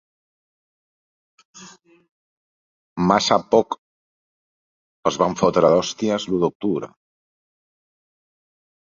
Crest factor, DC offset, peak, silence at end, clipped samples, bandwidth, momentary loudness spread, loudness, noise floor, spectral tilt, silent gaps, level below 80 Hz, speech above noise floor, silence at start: 22 dB; under 0.1%; -2 dBFS; 2.05 s; under 0.1%; 7.6 kHz; 13 LU; -20 LUFS; under -90 dBFS; -5 dB/octave; 2.11-2.96 s, 3.78-5.03 s, 6.55-6.60 s; -58 dBFS; over 70 dB; 1.55 s